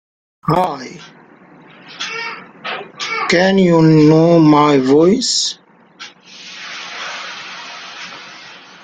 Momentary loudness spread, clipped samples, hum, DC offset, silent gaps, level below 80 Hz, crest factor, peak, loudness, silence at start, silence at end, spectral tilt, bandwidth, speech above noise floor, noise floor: 24 LU; under 0.1%; none; under 0.1%; none; -54 dBFS; 14 dB; -2 dBFS; -13 LUFS; 0.45 s; 0.3 s; -5.5 dB/octave; 9.4 kHz; 32 dB; -43 dBFS